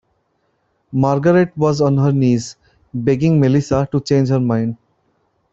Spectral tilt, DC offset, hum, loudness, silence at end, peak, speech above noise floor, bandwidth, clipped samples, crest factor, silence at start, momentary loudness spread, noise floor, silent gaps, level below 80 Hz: -8 dB/octave; under 0.1%; none; -16 LUFS; 0.8 s; -2 dBFS; 50 dB; 7.8 kHz; under 0.1%; 14 dB; 0.9 s; 11 LU; -65 dBFS; none; -48 dBFS